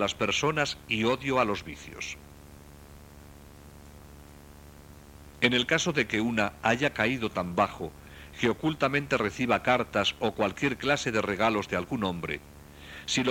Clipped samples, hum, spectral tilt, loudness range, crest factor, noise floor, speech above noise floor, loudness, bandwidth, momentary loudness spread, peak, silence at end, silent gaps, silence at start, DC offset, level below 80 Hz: under 0.1%; none; -4 dB/octave; 8 LU; 22 dB; -49 dBFS; 21 dB; -28 LUFS; 17 kHz; 13 LU; -8 dBFS; 0 s; none; 0 s; under 0.1%; -52 dBFS